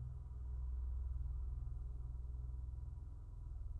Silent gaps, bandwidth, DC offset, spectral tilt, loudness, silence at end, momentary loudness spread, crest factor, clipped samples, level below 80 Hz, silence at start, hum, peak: none; 1.6 kHz; under 0.1%; -9.5 dB/octave; -49 LUFS; 0 s; 7 LU; 10 dB; under 0.1%; -46 dBFS; 0 s; none; -34 dBFS